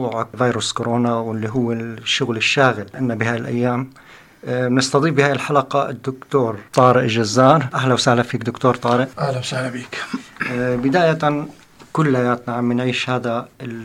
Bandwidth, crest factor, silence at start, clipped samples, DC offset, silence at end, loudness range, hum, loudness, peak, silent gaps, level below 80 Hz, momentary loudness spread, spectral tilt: 13 kHz; 18 dB; 0 s; under 0.1%; under 0.1%; 0 s; 4 LU; none; -19 LUFS; 0 dBFS; none; -56 dBFS; 11 LU; -5.5 dB/octave